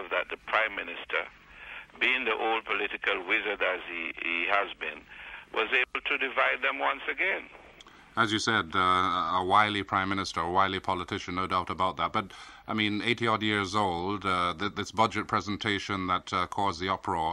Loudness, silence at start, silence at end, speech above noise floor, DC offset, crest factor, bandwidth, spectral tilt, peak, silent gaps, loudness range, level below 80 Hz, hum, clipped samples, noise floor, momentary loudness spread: -28 LUFS; 0 s; 0 s; 24 dB; under 0.1%; 20 dB; 13 kHz; -4 dB/octave; -10 dBFS; none; 3 LU; -60 dBFS; none; under 0.1%; -53 dBFS; 9 LU